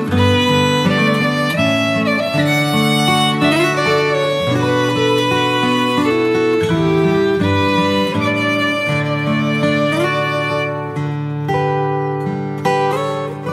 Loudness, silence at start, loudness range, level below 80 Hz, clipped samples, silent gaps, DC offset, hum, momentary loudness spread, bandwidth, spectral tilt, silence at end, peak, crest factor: -15 LUFS; 0 s; 3 LU; -50 dBFS; under 0.1%; none; under 0.1%; none; 6 LU; 16 kHz; -5.5 dB/octave; 0 s; -2 dBFS; 14 dB